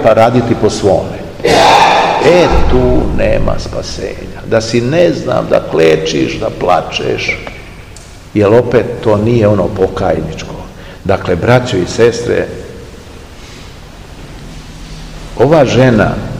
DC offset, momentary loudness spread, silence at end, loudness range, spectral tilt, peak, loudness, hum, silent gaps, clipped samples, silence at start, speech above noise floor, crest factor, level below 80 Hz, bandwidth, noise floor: 0.5%; 22 LU; 0 s; 6 LU; -6 dB/octave; 0 dBFS; -11 LUFS; none; none; 1%; 0 s; 22 dB; 12 dB; -24 dBFS; 16 kHz; -32 dBFS